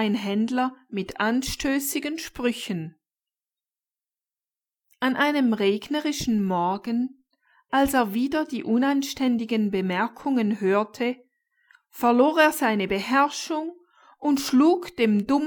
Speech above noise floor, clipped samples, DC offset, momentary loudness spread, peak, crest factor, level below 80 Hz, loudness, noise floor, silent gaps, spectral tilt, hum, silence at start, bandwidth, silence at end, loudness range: over 67 dB; under 0.1%; under 0.1%; 10 LU; -4 dBFS; 20 dB; -54 dBFS; -24 LUFS; under -90 dBFS; none; -4.5 dB/octave; none; 0 s; 19.5 kHz; 0 s; 6 LU